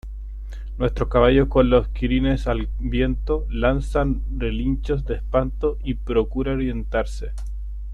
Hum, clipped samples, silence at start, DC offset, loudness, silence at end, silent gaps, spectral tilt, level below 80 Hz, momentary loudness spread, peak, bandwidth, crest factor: none; under 0.1%; 0.05 s; under 0.1%; -22 LUFS; 0 s; none; -8 dB/octave; -26 dBFS; 16 LU; -4 dBFS; 9 kHz; 18 dB